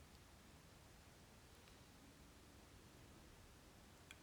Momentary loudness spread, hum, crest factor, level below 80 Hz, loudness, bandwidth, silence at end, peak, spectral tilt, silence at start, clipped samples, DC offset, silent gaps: 1 LU; none; 24 dB; -72 dBFS; -64 LUFS; over 20 kHz; 0 s; -40 dBFS; -4 dB/octave; 0 s; under 0.1%; under 0.1%; none